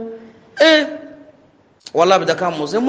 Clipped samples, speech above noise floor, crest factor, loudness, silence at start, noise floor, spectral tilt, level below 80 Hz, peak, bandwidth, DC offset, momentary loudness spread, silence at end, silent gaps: under 0.1%; 38 dB; 18 dB; -15 LUFS; 0 s; -52 dBFS; -4 dB/octave; -66 dBFS; 0 dBFS; 9.4 kHz; under 0.1%; 21 LU; 0 s; none